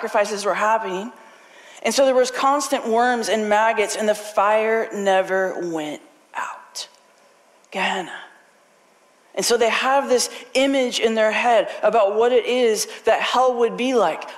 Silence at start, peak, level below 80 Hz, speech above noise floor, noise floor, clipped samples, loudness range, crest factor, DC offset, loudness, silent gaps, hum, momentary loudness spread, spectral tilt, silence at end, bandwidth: 0 s; -8 dBFS; -68 dBFS; 36 dB; -56 dBFS; under 0.1%; 9 LU; 12 dB; under 0.1%; -20 LUFS; none; none; 13 LU; -2.5 dB/octave; 0 s; 15.5 kHz